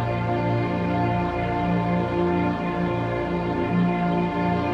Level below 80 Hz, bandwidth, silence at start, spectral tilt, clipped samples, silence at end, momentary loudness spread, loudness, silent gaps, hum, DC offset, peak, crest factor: -42 dBFS; 6.2 kHz; 0 s; -9 dB/octave; under 0.1%; 0 s; 3 LU; -24 LUFS; none; 60 Hz at -45 dBFS; under 0.1%; -10 dBFS; 12 dB